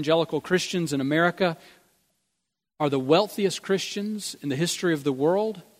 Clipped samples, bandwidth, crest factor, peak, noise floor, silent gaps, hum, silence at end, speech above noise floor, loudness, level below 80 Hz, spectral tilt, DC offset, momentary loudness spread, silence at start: under 0.1%; 16 kHz; 20 dB; -6 dBFS; -82 dBFS; none; none; 0.2 s; 57 dB; -25 LUFS; -70 dBFS; -4.5 dB/octave; under 0.1%; 8 LU; 0 s